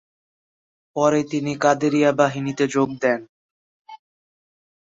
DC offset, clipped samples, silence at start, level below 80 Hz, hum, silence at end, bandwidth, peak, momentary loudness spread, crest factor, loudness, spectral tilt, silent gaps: under 0.1%; under 0.1%; 0.95 s; -64 dBFS; none; 0.9 s; 8 kHz; -4 dBFS; 6 LU; 20 dB; -20 LUFS; -5.5 dB/octave; 3.29-3.85 s